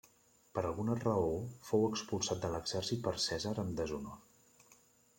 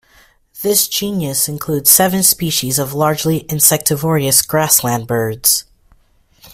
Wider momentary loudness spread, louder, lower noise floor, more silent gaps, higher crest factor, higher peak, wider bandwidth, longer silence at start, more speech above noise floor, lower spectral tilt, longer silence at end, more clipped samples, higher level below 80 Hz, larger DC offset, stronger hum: about the same, 9 LU vs 8 LU; second, -37 LUFS vs -13 LUFS; first, -67 dBFS vs -53 dBFS; neither; about the same, 20 dB vs 16 dB; second, -18 dBFS vs 0 dBFS; second, 16.5 kHz vs over 20 kHz; about the same, 0.55 s vs 0.55 s; second, 31 dB vs 38 dB; first, -5 dB/octave vs -3 dB/octave; first, 0.45 s vs 0.05 s; neither; second, -62 dBFS vs -48 dBFS; neither; neither